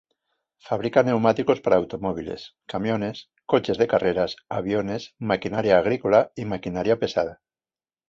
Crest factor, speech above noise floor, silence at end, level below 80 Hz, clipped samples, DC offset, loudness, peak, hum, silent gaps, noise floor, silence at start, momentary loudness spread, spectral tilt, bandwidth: 20 dB; over 67 dB; 0.75 s; -54 dBFS; under 0.1%; under 0.1%; -23 LUFS; -4 dBFS; none; none; under -90 dBFS; 0.65 s; 11 LU; -7 dB/octave; 7.6 kHz